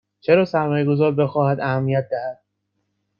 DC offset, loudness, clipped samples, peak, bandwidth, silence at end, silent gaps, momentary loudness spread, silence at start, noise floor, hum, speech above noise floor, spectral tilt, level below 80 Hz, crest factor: under 0.1%; -20 LUFS; under 0.1%; -4 dBFS; 6.8 kHz; 0.85 s; none; 9 LU; 0.3 s; -73 dBFS; none; 55 dB; -9.5 dB/octave; -62 dBFS; 18 dB